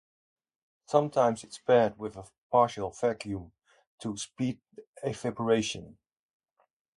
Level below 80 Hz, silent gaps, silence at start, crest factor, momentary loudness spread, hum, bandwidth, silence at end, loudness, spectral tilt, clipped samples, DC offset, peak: -62 dBFS; 2.38-2.50 s, 3.87-3.98 s, 4.87-4.93 s; 0.9 s; 22 dB; 16 LU; none; 11.5 kHz; 1.05 s; -29 LUFS; -5 dB/octave; under 0.1%; under 0.1%; -8 dBFS